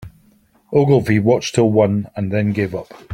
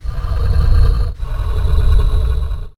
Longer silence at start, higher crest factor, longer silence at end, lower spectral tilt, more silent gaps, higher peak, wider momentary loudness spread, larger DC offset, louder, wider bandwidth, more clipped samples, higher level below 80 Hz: about the same, 0 s vs 0.05 s; about the same, 16 dB vs 12 dB; about the same, 0 s vs 0.1 s; about the same, -7 dB/octave vs -7.5 dB/octave; neither; about the same, 0 dBFS vs -2 dBFS; about the same, 8 LU vs 8 LU; neither; about the same, -17 LUFS vs -18 LUFS; first, 13.5 kHz vs 11 kHz; neither; second, -50 dBFS vs -14 dBFS